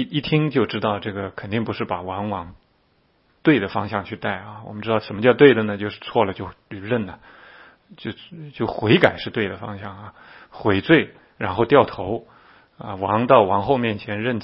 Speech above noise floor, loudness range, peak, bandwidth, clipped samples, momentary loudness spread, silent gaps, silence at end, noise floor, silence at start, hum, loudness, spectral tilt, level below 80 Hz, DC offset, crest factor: 42 dB; 5 LU; 0 dBFS; 5.8 kHz; under 0.1%; 19 LU; none; 0 s; -62 dBFS; 0 s; none; -21 LUFS; -9 dB/octave; -54 dBFS; under 0.1%; 22 dB